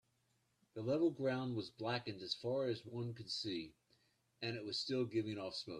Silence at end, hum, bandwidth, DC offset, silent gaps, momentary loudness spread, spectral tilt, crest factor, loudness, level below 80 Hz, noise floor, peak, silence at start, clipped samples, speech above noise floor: 0 s; none; 11 kHz; under 0.1%; none; 10 LU; -5.5 dB/octave; 18 dB; -41 LUFS; -80 dBFS; -80 dBFS; -24 dBFS; 0.75 s; under 0.1%; 39 dB